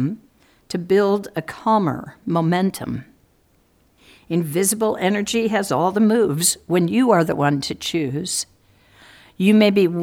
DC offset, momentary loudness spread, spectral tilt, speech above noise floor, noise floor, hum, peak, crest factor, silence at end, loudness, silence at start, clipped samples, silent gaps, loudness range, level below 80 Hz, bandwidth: under 0.1%; 13 LU; -5 dB/octave; 41 dB; -59 dBFS; none; -2 dBFS; 18 dB; 0 s; -19 LUFS; 0 s; under 0.1%; none; 5 LU; -58 dBFS; 17.5 kHz